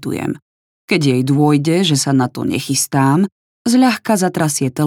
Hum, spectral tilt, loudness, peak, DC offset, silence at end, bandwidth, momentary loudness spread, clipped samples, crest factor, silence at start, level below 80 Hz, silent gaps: none; -5 dB/octave; -15 LUFS; -2 dBFS; under 0.1%; 0 s; 18 kHz; 8 LU; under 0.1%; 14 dB; 0 s; -60 dBFS; 0.42-0.88 s, 3.32-3.65 s